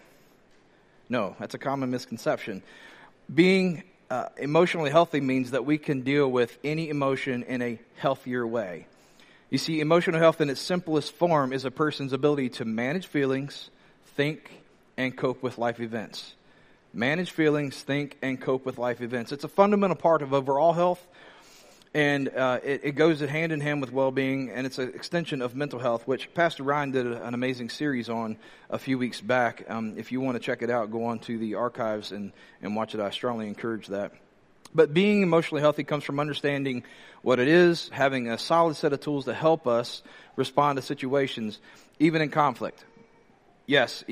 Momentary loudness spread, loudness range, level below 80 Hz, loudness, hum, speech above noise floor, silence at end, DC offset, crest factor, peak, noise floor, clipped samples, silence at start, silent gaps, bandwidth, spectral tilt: 11 LU; 6 LU; -70 dBFS; -27 LUFS; none; 33 dB; 0 s; under 0.1%; 22 dB; -6 dBFS; -59 dBFS; under 0.1%; 1.1 s; none; 15 kHz; -6 dB/octave